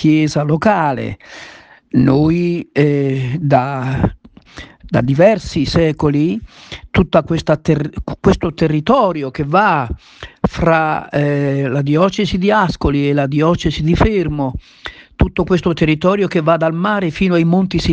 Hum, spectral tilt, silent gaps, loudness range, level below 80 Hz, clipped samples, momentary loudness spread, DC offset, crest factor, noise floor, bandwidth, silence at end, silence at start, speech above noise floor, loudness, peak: none; -7.5 dB/octave; none; 1 LU; -32 dBFS; under 0.1%; 11 LU; under 0.1%; 14 dB; -37 dBFS; 8.6 kHz; 0 s; 0 s; 23 dB; -15 LUFS; 0 dBFS